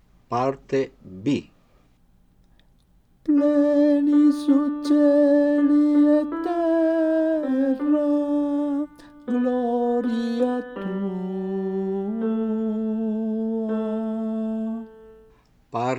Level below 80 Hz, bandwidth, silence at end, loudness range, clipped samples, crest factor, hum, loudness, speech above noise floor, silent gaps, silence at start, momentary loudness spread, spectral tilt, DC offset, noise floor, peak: -60 dBFS; 9 kHz; 0 s; 8 LU; under 0.1%; 14 dB; none; -22 LUFS; 39 dB; none; 0.3 s; 11 LU; -8 dB/octave; under 0.1%; -58 dBFS; -10 dBFS